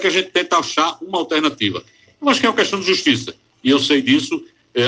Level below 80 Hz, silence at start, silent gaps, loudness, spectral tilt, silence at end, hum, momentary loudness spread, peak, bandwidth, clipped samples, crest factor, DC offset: -62 dBFS; 0 s; none; -17 LUFS; -3.5 dB/octave; 0 s; none; 10 LU; 0 dBFS; 9.8 kHz; under 0.1%; 18 dB; under 0.1%